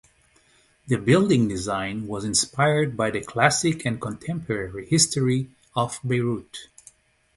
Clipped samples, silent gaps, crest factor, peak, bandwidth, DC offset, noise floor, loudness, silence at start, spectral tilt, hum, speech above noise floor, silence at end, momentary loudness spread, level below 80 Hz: under 0.1%; none; 24 dB; -2 dBFS; 11.5 kHz; under 0.1%; -60 dBFS; -23 LUFS; 0.85 s; -4.5 dB/octave; none; 37 dB; 0.7 s; 11 LU; -52 dBFS